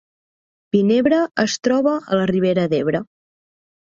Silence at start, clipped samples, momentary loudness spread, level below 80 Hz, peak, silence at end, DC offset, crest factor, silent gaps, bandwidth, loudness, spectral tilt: 0.75 s; under 0.1%; 5 LU; -58 dBFS; -4 dBFS; 0.9 s; under 0.1%; 16 dB; none; 7.6 kHz; -18 LUFS; -5.5 dB/octave